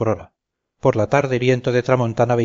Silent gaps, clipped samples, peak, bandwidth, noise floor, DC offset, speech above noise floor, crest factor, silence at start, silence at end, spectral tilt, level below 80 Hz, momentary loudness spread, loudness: none; under 0.1%; -2 dBFS; 7.6 kHz; -72 dBFS; under 0.1%; 54 dB; 16 dB; 0 s; 0 s; -7 dB/octave; -52 dBFS; 5 LU; -19 LUFS